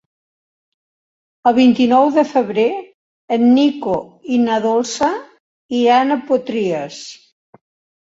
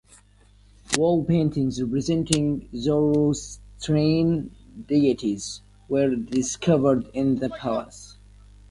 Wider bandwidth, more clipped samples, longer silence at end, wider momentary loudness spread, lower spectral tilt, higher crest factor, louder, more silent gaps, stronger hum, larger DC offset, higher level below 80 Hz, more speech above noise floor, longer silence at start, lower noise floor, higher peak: second, 7.8 kHz vs 11.5 kHz; neither; first, 0.85 s vs 0.55 s; about the same, 12 LU vs 13 LU; about the same, -5 dB/octave vs -6 dB/octave; second, 16 dB vs 22 dB; first, -16 LUFS vs -23 LUFS; first, 2.94-3.28 s, 5.40-5.69 s vs none; second, none vs 50 Hz at -45 dBFS; neither; second, -60 dBFS vs -48 dBFS; first, over 75 dB vs 32 dB; first, 1.45 s vs 0.9 s; first, under -90 dBFS vs -54 dBFS; about the same, -2 dBFS vs -2 dBFS